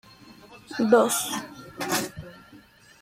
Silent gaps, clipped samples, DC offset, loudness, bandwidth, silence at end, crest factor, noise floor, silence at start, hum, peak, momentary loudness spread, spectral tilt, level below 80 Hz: none; under 0.1%; under 0.1%; -24 LUFS; 16.5 kHz; 0.45 s; 22 dB; -52 dBFS; 0.25 s; none; -6 dBFS; 22 LU; -3 dB/octave; -62 dBFS